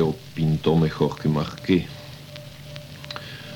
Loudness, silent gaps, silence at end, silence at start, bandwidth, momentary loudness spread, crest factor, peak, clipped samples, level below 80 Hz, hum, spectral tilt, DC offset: -24 LUFS; none; 0 s; 0 s; 18 kHz; 18 LU; 18 dB; -6 dBFS; under 0.1%; -48 dBFS; none; -7.5 dB/octave; under 0.1%